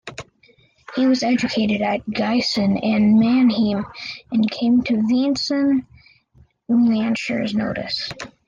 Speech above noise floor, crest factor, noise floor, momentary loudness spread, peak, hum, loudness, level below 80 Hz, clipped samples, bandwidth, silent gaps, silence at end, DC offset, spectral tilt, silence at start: 37 dB; 12 dB; -56 dBFS; 9 LU; -8 dBFS; none; -19 LUFS; -54 dBFS; under 0.1%; 7.4 kHz; none; 0.2 s; under 0.1%; -5.5 dB/octave; 0.05 s